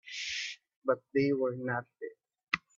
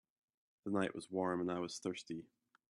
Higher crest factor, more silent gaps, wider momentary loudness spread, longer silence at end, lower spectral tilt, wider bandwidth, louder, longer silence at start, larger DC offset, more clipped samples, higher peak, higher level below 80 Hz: about the same, 24 dB vs 20 dB; first, 0.76-0.82 s vs none; first, 15 LU vs 11 LU; second, 0.2 s vs 0.45 s; about the same, -4.5 dB/octave vs -5.5 dB/octave; second, 7.8 kHz vs 12 kHz; first, -34 LUFS vs -41 LUFS; second, 0.05 s vs 0.65 s; neither; neither; first, -12 dBFS vs -22 dBFS; first, -74 dBFS vs -80 dBFS